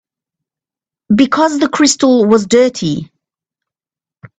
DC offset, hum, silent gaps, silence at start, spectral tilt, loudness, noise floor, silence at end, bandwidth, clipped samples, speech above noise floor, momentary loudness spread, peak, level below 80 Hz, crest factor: under 0.1%; none; none; 1.1 s; -4.5 dB/octave; -11 LUFS; under -90 dBFS; 1.35 s; 9.2 kHz; under 0.1%; over 79 dB; 9 LU; 0 dBFS; -52 dBFS; 14 dB